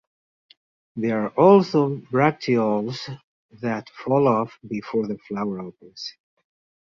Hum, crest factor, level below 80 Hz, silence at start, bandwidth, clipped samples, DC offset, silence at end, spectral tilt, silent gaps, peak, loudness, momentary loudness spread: none; 20 dB; -64 dBFS; 0.95 s; 7.2 kHz; under 0.1%; under 0.1%; 0.75 s; -7.5 dB/octave; 3.24-3.49 s; -2 dBFS; -22 LUFS; 19 LU